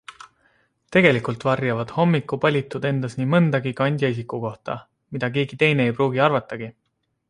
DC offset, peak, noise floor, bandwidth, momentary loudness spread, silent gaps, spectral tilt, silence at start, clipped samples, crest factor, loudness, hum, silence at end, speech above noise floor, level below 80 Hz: under 0.1%; -2 dBFS; -64 dBFS; 11 kHz; 14 LU; none; -7.5 dB/octave; 0.1 s; under 0.1%; 20 dB; -21 LUFS; none; 0.6 s; 43 dB; -60 dBFS